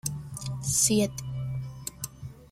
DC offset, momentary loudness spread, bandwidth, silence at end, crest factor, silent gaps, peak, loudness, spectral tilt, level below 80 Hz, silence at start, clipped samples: under 0.1%; 16 LU; 16.5 kHz; 0.05 s; 20 dB; none; -10 dBFS; -28 LUFS; -4 dB/octave; -52 dBFS; 0.05 s; under 0.1%